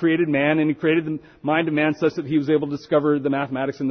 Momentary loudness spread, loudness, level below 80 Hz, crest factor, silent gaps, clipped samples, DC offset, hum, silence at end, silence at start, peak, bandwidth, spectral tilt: 5 LU; -21 LUFS; -62 dBFS; 14 dB; none; under 0.1%; under 0.1%; none; 0 s; 0 s; -6 dBFS; 6.4 kHz; -8 dB/octave